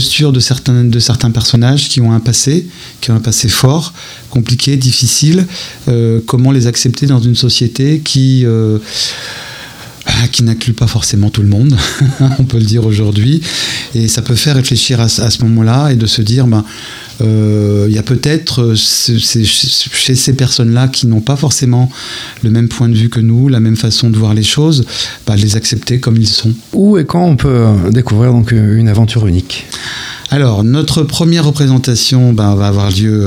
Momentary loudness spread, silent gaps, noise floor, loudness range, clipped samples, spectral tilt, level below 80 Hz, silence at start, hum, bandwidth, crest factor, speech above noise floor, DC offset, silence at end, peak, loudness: 7 LU; none; -29 dBFS; 2 LU; under 0.1%; -5 dB/octave; -34 dBFS; 0 s; none; 15.5 kHz; 10 dB; 20 dB; under 0.1%; 0 s; 0 dBFS; -10 LUFS